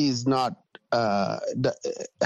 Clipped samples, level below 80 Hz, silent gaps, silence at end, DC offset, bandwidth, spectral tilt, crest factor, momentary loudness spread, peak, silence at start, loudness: under 0.1%; -68 dBFS; none; 0 s; under 0.1%; 11 kHz; -5.5 dB/octave; 16 dB; 10 LU; -10 dBFS; 0 s; -27 LUFS